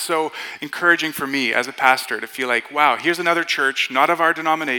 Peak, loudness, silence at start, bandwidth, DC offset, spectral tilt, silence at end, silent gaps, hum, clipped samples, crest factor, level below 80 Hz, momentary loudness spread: -2 dBFS; -18 LUFS; 0 s; 19 kHz; under 0.1%; -2.5 dB/octave; 0 s; none; none; under 0.1%; 18 dB; -74 dBFS; 7 LU